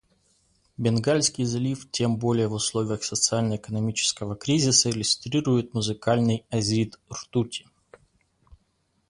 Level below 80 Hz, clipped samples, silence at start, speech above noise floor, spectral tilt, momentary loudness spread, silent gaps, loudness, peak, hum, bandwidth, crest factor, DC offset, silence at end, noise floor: -56 dBFS; under 0.1%; 0.8 s; 46 dB; -4 dB/octave; 8 LU; none; -24 LUFS; -6 dBFS; none; 11.5 kHz; 20 dB; under 0.1%; 1.5 s; -70 dBFS